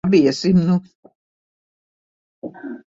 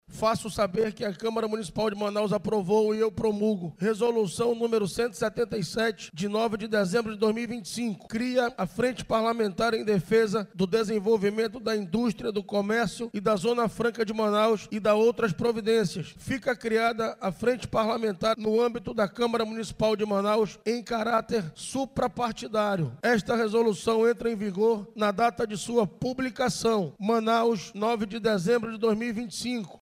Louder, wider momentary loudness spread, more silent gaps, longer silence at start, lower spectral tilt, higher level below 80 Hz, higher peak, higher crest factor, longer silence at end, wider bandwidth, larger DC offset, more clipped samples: first, -17 LUFS vs -27 LUFS; first, 21 LU vs 6 LU; first, 0.95-1.03 s, 1.15-2.42 s vs none; about the same, 0.05 s vs 0.1 s; first, -7 dB/octave vs -5.5 dB/octave; about the same, -54 dBFS vs -56 dBFS; first, -4 dBFS vs -12 dBFS; about the same, 16 dB vs 14 dB; about the same, 0.1 s vs 0.05 s; second, 7.8 kHz vs 16 kHz; neither; neither